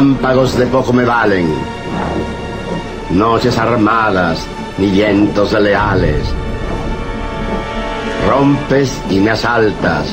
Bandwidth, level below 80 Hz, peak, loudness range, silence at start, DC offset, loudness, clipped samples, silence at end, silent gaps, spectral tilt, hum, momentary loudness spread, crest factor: 16 kHz; -26 dBFS; -2 dBFS; 3 LU; 0 s; under 0.1%; -14 LUFS; under 0.1%; 0 s; none; -6.5 dB/octave; none; 10 LU; 12 dB